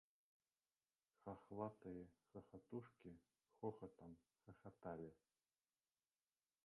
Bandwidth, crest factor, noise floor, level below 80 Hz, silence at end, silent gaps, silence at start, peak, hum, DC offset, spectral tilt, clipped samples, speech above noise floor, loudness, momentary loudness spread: 3.6 kHz; 26 dB; under -90 dBFS; -82 dBFS; 1.5 s; none; 1.25 s; -34 dBFS; none; under 0.1%; -6.5 dB/octave; under 0.1%; over 33 dB; -57 LUFS; 12 LU